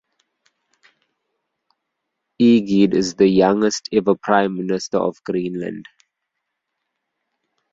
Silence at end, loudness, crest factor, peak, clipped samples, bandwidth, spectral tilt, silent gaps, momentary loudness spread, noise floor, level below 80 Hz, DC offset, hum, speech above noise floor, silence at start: 1.9 s; -18 LUFS; 18 dB; -2 dBFS; under 0.1%; 7.8 kHz; -5.5 dB/octave; none; 11 LU; -78 dBFS; -58 dBFS; under 0.1%; none; 61 dB; 2.4 s